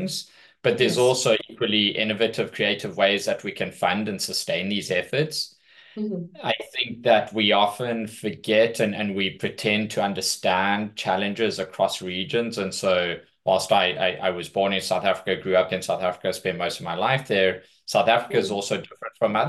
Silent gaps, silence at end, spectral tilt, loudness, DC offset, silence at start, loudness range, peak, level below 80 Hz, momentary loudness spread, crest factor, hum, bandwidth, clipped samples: none; 0 s; -3.5 dB/octave; -23 LUFS; under 0.1%; 0 s; 2 LU; -4 dBFS; -68 dBFS; 9 LU; 20 dB; none; 12.5 kHz; under 0.1%